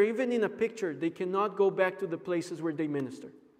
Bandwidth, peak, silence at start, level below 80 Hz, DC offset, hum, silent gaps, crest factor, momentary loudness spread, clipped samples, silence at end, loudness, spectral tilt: 12 kHz; -12 dBFS; 0 s; -80 dBFS; under 0.1%; none; none; 18 dB; 8 LU; under 0.1%; 0.2 s; -31 LUFS; -6.5 dB/octave